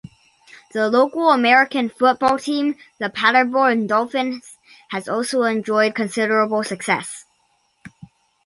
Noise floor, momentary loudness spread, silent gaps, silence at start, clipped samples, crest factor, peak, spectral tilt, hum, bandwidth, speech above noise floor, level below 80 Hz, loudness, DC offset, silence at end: -64 dBFS; 12 LU; none; 0.75 s; under 0.1%; 18 dB; -2 dBFS; -4 dB/octave; none; 11.5 kHz; 46 dB; -64 dBFS; -18 LUFS; under 0.1%; 0.6 s